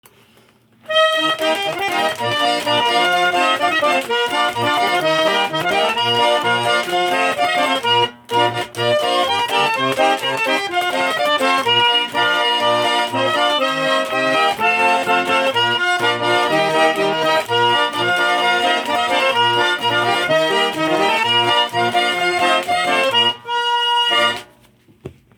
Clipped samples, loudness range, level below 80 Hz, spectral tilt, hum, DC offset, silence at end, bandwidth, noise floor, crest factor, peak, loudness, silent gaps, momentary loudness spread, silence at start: under 0.1%; 1 LU; -62 dBFS; -2.5 dB/octave; none; under 0.1%; 0.25 s; over 20 kHz; -52 dBFS; 14 dB; -2 dBFS; -16 LUFS; none; 3 LU; 0.9 s